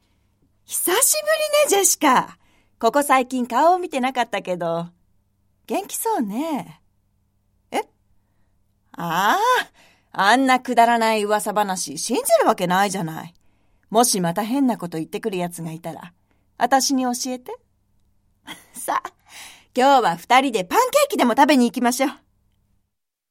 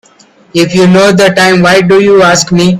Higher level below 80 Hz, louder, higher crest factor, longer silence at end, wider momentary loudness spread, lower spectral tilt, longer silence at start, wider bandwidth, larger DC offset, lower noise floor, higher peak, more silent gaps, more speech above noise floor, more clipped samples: second, -66 dBFS vs -42 dBFS; second, -19 LUFS vs -5 LUFS; first, 20 dB vs 6 dB; first, 1.15 s vs 0 s; first, 17 LU vs 5 LU; second, -3 dB/octave vs -5 dB/octave; first, 0.7 s vs 0.55 s; first, 16.5 kHz vs 13.5 kHz; neither; first, -75 dBFS vs -42 dBFS; about the same, -2 dBFS vs 0 dBFS; neither; first, 55 dB vs 37 dB; second, under 0.1% vs 0.6%